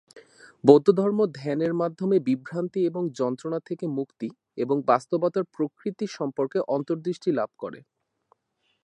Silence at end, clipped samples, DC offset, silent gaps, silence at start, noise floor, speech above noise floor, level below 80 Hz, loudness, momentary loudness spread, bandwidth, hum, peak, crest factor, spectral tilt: 1.05 s; under 0.1%; under 0.1%; none; 0.15 s; -74 dBFS; 49 dB; -78 dBFS; -25 LUFS; 12 LU; 9.2 kHz; none; -2 dBFS; 24 dB; -7.5 dB/octave